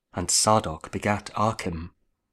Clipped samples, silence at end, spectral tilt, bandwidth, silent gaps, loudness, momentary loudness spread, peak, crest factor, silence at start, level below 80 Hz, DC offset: under 0.1%; 0.45 s; -3.5 dB/octave; 15.5 kHz; none; -24 LUFS; 15 LU; -6 dBFS; 20 dB; 0.15 s; -48 dBFS; under 0.1%